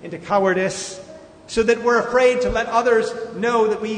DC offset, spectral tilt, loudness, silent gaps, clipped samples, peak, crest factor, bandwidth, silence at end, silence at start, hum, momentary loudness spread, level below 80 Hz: under 0.1%; -4 dB/octave; -19 LUFS; none; under 0.1%; -4 dBFS; 16 dB; 9.6 kHz; 0 s; 0 s; none; 10 LU; -44 dBFS